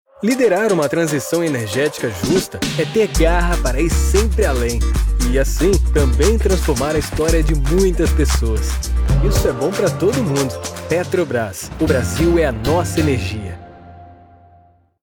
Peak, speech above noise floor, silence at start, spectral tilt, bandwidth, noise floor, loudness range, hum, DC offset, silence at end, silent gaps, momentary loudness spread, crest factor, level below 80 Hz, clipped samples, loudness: -2 dBFS; 35 dB; 0.2 s; -5.5 dB/octave; 19.5 kHz; -51 dBFS; 2 LU; none; under 0.1%; 0.9 s; none; 6 LU; 14 dB; -20 dBFS; under 0.1%; -17 LUFS